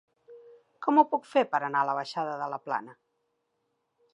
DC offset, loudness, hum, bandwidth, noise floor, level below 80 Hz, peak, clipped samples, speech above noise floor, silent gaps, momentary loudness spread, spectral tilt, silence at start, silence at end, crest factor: under 0.1%; -28 LUFS; none; 10.5 kHz; -78 dBFS; -90 dBFS; -8 dBFS; under 0.1%; 51 dB; none; 11 LU; -5.5 dB/octave; 0.3 s; 1.2 s; 22 dB